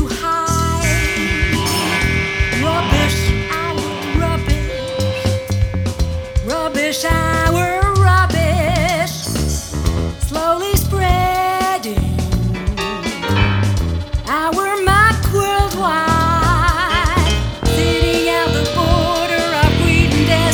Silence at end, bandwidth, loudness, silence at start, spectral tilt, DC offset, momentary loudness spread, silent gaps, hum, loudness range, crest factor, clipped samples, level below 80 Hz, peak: 0 s; over 20 kHz; -16 LUFS; 0 s; -5 dB/octave; under 0.1%; 7 LU; none; none; 4 LU; 16 dB; under 0.1%; -24 dBFS; 0 dBFS